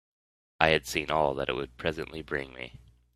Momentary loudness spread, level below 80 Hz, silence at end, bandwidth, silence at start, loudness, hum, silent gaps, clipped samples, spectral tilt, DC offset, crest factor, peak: 15 LU; -52 dBFS; 0.4 s; 15 kHz; 0.6 s; -29 LUFS; none; none; under 0.1%; -4 dB/octave; under 0.1%; 30 dB; -2 dBFS